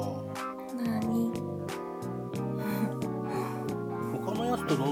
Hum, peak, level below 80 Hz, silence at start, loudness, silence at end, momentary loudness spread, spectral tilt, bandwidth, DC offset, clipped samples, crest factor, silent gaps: none; -16 dBFS; -62 dBFS; 0 s; -33 LUFS; 0 s; 7 LU; -6.5 dB/octave; 17.5 kHz; under 0.1%; under 0.1%; 16 dB; none